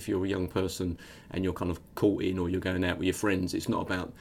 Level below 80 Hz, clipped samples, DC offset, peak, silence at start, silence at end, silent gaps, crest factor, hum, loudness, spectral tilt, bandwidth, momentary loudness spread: -52 dBFS; under 0.1%; under 0.1%; -14 dBFS; 0 s; 0 s; none; 18 dB; none; -31 LUFS; -5.5 dB/octave; 16.5 kHz; 7 LU